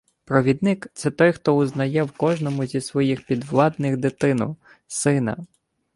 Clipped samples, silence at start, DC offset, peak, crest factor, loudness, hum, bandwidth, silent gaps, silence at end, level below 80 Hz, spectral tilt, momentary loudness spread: under 0.1%; 0.3 s; under 0.1%; -2 dBFS; 20 dB; -22 LUFS; none; 11.5 kHz; none; 0.5 s; -58 dBFS; -6.5 dB/octave; 8 LU